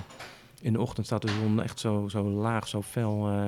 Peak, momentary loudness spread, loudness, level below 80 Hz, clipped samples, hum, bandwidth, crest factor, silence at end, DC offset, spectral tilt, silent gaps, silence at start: -14 dBFS; 8 LU; -30 LUFS; -60 dBFS; under 0.1%; none; 14.5 kHz; 16 dB; 0 s; under 0.1%; -6.5 dB/octave; none; 0 s